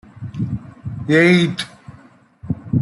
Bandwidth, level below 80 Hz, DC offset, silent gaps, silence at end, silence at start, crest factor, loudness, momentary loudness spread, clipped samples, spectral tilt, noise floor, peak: 11.5 kHz; -48 dBFS; under 0.1%; none; 0 s; 0.15 s; 16 dB; -18 LUFS; 19 LU; under 0.1%; -6.5 dB/octave; -47 dBFS; -2 dBFS